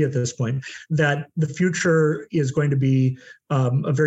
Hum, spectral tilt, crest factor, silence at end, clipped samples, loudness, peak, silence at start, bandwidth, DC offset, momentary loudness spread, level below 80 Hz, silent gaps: none; -6.5 dB/octave; 14 dB; 0 s; under 0.1%; -22 LUFS; -8 dBFS; 0 s; 8.2 kHz; under 0.1%; 7 LU; -62 dBFS; none